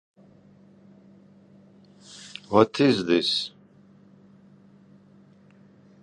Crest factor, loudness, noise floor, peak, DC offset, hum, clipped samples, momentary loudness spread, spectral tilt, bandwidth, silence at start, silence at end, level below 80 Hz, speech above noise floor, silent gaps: 26 dB; -22 LUFS; -54 dBFS; -4 dBFS; under 0.1%; none; under 0.1%; 22 LU; -5.5 dB/octave; 11 kHz; 2.1 s; 2.55 s; -66 dBFS; 33 dB; none